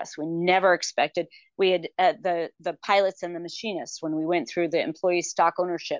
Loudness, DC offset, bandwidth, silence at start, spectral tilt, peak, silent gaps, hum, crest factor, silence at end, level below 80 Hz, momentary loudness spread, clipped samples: -25 LUFS; under 0.1%; 7.6 kHz; 0 s; -4 dB/octave; -8 dBFS; none; none; 16 dB; 0 s; -78 dBFS; 10 LU; under 0.1%